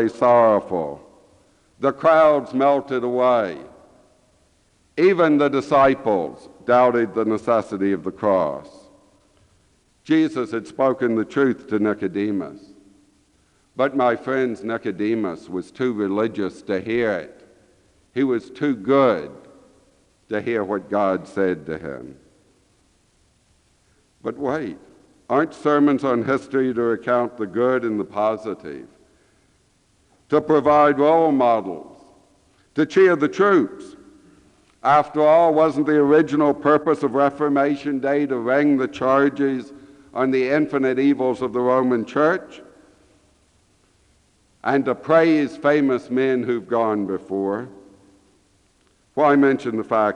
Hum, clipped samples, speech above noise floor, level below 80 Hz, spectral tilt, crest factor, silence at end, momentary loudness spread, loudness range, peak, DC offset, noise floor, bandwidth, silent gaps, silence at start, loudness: none; under 0.1%; 42 dB; -62 dBFS; -7 dB/octave; 16 dB; 0 s; 13 LU; 7 LU; -4 dBFS; under 0.1%; -61 dBFS; 9.8 kHz; none; 0 s; -20 LUFS